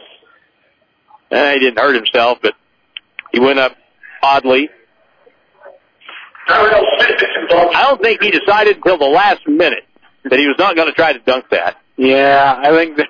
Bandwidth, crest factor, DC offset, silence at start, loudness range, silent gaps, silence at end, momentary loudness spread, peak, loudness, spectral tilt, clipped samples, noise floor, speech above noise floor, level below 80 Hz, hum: 5.4 kHz; 12 dB; under 0.1%; 1.3 s; 5 LU; none; 0 s; 11 LU; -2 dBFS; -12 LUFS; -5 dB/octave; under 0.1%; -58 dBFS; 47 dB; -50 dBFS; none